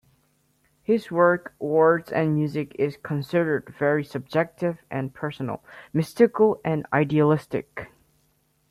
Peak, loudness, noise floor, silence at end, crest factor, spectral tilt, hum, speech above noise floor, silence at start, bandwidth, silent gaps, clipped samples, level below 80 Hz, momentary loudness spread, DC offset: -4 dBFS; -24 LUFS; -67 dBFS; 0.85 s; 20 dB; -8 dB/octave; none; 44 dB; 0.9 s; 14 kHz; none; under 0.1%; -62 dBFS; 12 LU; under 0.1%